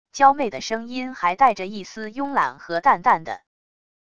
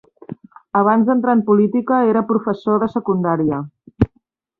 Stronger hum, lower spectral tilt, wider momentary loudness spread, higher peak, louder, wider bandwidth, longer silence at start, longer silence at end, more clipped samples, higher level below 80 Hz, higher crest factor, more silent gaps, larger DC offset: neither; second, -4 dB/octave vs -11 dB/octave; second, 15 LU vs 20 LU; about the same, -2 dBFS vs -2 dBFS; second, -21 LUFS vs -17 LUFS; first, 7.8 kHz vs 4.5 kHz; second, 0.15 s vs 0.3 s; first, 0.8 s vs 0.55 s; neither; second, -60 dBFS vs -42 dBFS; about the same, 20 dB vs 16 dB; neither; first, 0.5% vs under 0.1%